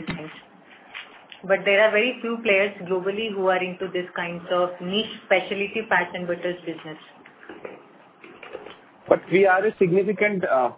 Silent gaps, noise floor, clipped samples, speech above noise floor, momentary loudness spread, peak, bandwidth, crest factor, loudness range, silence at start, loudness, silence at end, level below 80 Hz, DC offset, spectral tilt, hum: none; -49 dBFS; under 0.1%; 27 dB; 22 LU; -2 dBFS; 4 kHz; 22 dB; 7 LU; 0 s; -22 LUFS; 0 s; -64 dBFS; under 0.1%; -8.5 dB/octave; none